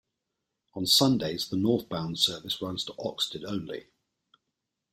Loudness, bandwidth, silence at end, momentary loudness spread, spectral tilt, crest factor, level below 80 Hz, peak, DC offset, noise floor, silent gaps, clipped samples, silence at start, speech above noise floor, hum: -27 LUFS; 16 kHz; 1.1 s; 14 LU; -4 dB/octave; 22 dB; -64 dBFS; -8 dBFS; under 0.1%; -84 dBFS; none; under 0.1%; 0.75 s; 55 dB; none